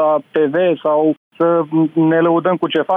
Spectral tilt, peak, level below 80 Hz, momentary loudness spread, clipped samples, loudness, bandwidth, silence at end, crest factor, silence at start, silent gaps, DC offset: -9.5 dB/octave; -6 dBFS; -68 dBFS; 3 LU; under 0.1%; -15 LUFS; 3.7 kHz; 0 s; 8 dB; 0 s; 1.17-1.31 s; under 0.1%